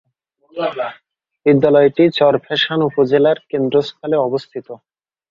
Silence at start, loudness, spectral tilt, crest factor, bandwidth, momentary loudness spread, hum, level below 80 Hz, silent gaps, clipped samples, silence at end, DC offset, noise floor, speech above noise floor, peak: 0.55 s; -16 LUFS; -7.5 dB/octave; 16 dB; 7.2 kHz; 14 LU; none; -60 dBFS; none; under 0.1%; 0.55 s; under 0.1%; -56 dBFS; 41 dB; 0 dBFS